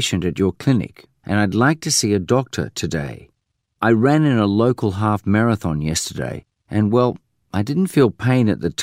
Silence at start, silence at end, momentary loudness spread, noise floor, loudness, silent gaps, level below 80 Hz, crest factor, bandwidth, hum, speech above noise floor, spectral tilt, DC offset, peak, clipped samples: 0 s; 0 s; 10 LU; -72 dBFS; -19 LUFS; none; -46 dBFS; 16 dB; 16 kHz; none; 55 dB; -5.5 dB/octave; under 0.1%; -2 dBFS; under 0.1%